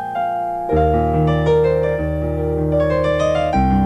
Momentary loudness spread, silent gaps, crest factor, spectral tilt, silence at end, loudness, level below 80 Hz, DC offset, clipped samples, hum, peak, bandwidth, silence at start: 6 LU; none; 12 dB; -8 dB/octave; 0 s; -18 LUFS; -28 dBFS; under 0.1%; under 0.1%; none; -4 dBFS; 9.2 kHz; 0 s